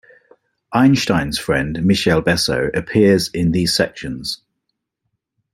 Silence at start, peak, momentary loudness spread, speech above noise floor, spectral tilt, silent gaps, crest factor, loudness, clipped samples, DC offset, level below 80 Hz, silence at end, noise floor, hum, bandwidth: 0.7 s; -2 dBFS; 11 LU; 59 dB; -5 dB/octave; none; 16 dB; -17 LUFS; under 0.1%; under 0.1%; -42 dBFS; 1.2 s; -75 dBFS; none; 16 kHz